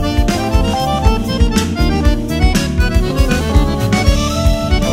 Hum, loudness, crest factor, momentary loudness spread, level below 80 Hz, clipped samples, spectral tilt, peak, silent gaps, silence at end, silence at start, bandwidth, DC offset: none; -15 LUFS; 12 dB; 2 LU; -16 dBFS; under 0.1%; -5.5 dB/octave; 0 dBFS; none; 0 s; 0 s; 16 kHz; under 0.1%